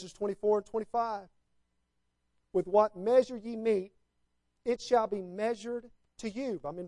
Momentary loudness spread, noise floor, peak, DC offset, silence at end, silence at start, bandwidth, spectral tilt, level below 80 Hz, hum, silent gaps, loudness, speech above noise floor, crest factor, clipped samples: 13 LU; -79 dBFS; -12 dBFS; under 0.1%; 0 s; 0 s; 11 kHz; -5.5 dB/octave; -68 dBFS; 60 Hz at -70 dBFS; none; -32 LUFS; 48 dB; 20 dB; under 0.1%